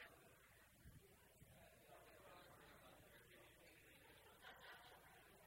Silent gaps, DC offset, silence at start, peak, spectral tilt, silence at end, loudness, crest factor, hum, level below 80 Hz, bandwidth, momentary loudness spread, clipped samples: none; under 0.1%; 0 s; -46 dBFS; -3.5 dB/octave; 0 s; -66 LUFS; 20 dB; none; -80 dBFS; 16 kHz; 7 LU; under 0.1%